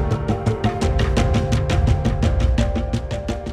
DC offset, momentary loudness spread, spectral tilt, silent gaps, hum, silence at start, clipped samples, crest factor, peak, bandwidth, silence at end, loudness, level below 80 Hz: under 0.1%; 6 LU; -6.5 dB/octave; none; none; 0 s; under 0.1%; 16 dB; -4 dBFS; 11 kHz; 0 s; -20 LUFS; -24 dBFS